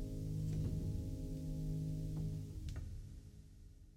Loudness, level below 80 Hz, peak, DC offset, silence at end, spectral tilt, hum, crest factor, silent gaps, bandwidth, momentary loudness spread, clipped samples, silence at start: -44 LUFS; -48 dBFS; -30 dBFS; under 0.1%; 0 s; -8 dB/octave; none; 14 dB; none; 16 kHz; 17 LU; under 0.1%; 0 s